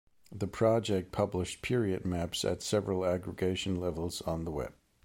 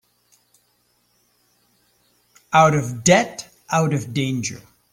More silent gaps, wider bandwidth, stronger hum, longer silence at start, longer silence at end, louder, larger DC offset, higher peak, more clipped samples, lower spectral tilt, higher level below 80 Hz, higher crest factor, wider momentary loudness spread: neither; about the same, 16.5 kHz vs 16 kHz; second, none vs 60 Hz at -45 dBFS; second, 0.3 s vs 2.5 s; about the same, 0.35 s vs 0.35 s; second, -33 LUFS vs -19 LUFS; neither; second, -14 dBFS vs -2 dBFS; neither; about the same, -5.5 dB/octave vs -4.5 dB/octave; about the same, -54 dBFS vs -58 dBFS; about the same, 18 dB vs 20 dB; second, 9 LU vs 14 LU